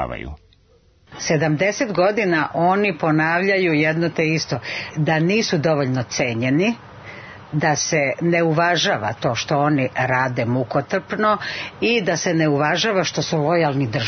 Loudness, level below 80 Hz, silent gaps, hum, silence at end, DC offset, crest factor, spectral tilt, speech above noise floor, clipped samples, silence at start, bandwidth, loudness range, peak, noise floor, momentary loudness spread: -19 LUFS; -52 dBFS; none; none; 0 s; under 0.1%; 14 dB; -5 dB/octave; 36 dB; under 0.1%; 0 s; 6.6 kHz; 2 LU; -6 dBFS; -55 dBFS; 7 LU